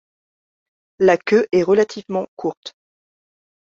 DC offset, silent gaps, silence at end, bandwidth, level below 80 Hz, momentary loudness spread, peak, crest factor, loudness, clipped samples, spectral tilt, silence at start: under 0.1%; 2.28-2.37 s, 2.57-2.63 s; 1 s; 7.6 kHz; -62 dBFS; 12 LU; -2 dBFS; 20 dB; -18 LUFS; under 0.1%; -6 dB/octave; 1 s